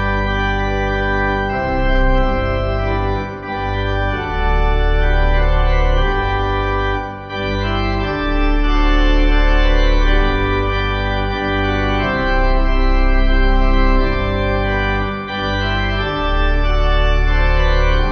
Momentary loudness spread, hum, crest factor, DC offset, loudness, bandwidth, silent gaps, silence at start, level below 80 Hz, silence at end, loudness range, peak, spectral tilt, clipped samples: 4 LU; none; 12 dB; under 0.1%; -18 LUFS; 6.2 kHz; none; 0 s; -16 dBFS; 0 s; 2 LU; -2 dBFS; -7 dB/octave; under 0.1%